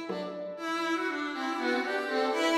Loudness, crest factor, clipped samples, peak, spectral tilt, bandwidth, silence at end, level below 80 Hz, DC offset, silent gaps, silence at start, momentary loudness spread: -31 LUFS; 14 dB; under 0.1%; -16 dBFS; -3.5 dB/octave; 15 kHz; 0 s; -82 dBFS; under 0.1%; none; 0 s; 7 LU